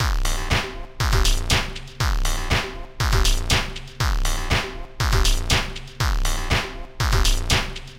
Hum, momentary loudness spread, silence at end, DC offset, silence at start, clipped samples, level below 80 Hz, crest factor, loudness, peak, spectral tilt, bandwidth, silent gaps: none; 6 LU; 0 s; under 0.1%; 0 s; under 0.1%; -24 dBFS; 16 dB; -23 LUFS; -4 dBFS; -3 dB/octave; 16.5 kHz; none